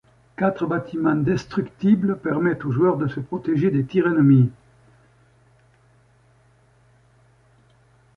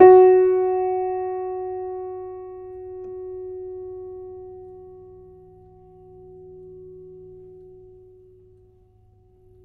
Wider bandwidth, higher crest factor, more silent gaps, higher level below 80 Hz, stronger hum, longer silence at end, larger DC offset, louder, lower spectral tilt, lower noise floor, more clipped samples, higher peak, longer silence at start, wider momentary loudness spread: first, 7 kHz vs 2.8 kHz; second, 16 dB vs 22 dB; neither; about the same, -56 dBFS vs -56 dBFS; neither; second, 3.65 s vs 4.95 s; neither; about the same, -21 LUFS vs -21 LUFS; second, -9.5 dB/octave vs -11 dB/octave; about the same, -57 dBFS vs -55 dBFS; neither; second, -6 dBFS vs 0 dBFS; first, 0.4 s vs 0 s; second, 9 LU vs 26 LU